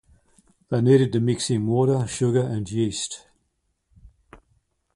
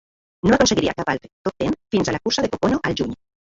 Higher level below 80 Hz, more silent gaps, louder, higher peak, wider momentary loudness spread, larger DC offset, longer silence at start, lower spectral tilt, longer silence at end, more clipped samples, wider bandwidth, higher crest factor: second, -54 dBFS vs -44 dBFS; second, none vs 1.33-1.45 s; about the same, -22 LUFS vs -21 LUFS; second, -6 dBFS vs -2 dBFS; about the same, 10 LU vs 10 LU; neither; first, 0.7 s vs 0.45 s; first, -6 dB/octave vs -4.5 dB/octave; first, 0.6 s vs 0.35 s; neither; first, 11.5 kHz vs 8 kHz; about the same, 20 dB vs 20 dB